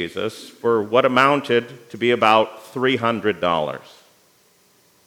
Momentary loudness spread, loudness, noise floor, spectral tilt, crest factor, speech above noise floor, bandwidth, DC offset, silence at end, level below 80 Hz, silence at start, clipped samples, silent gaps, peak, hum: 13 LU; -19 LUFS; -57 dBFS; -5.5 dB/octave; 20 dB; 38 dB; 17.5 kHz; under 0.1%; 1.3 s; -68 dBFS; 0 s; under 0.1%; none; 0 dBFS; none